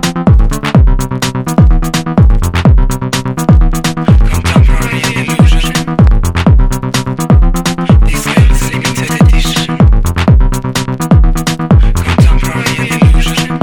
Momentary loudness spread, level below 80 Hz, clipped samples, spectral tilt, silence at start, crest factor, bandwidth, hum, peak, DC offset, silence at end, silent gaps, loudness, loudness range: 5 LU; -10 dBFS; 1%; -5.5 dB/octave; 0 s; 8 dB; 18.5 kHz; none; 0 dBFS; under 0.1%; 0 s; none; -10 LUFS; 1 LU